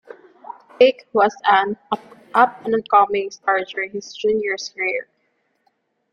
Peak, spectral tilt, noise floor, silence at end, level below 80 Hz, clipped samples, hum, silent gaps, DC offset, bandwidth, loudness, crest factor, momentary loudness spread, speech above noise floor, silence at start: 0 dBFS; -3.5 dB/octave; -68 dBFS; 1.1 s; -66 dBFS; under 0.1%; none; none; under 0.1%; 9.4 kHz; -19 LUFS; 20 dB; 12 LU; 49 dB; 0.8 s